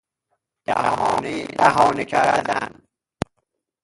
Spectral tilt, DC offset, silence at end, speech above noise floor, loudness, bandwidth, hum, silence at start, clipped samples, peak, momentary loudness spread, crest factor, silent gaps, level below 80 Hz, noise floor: -4.5 dB/octave; under 0.1%; 1.1 s; 55 dB; -20 LUFS; 11.5 kHz; none; 0.7 s; under 0.1%; 0 dBFS; 16 LU; 22 dB; none; -54 dBFS; -75 dBFS